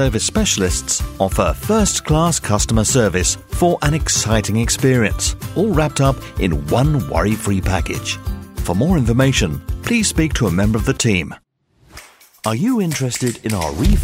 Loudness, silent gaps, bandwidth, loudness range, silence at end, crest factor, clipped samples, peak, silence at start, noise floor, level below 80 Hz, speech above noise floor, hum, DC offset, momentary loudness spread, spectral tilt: -17 LUFS; none; 16.5 kHz; 3 LU; 0 s; 16 dB; under 0.1%; 0 dBFS; 0 s; -53 dBFS; -26 dBFS; 37 dB; none; under 0.1%; 7 LU; -4.5 dB/octave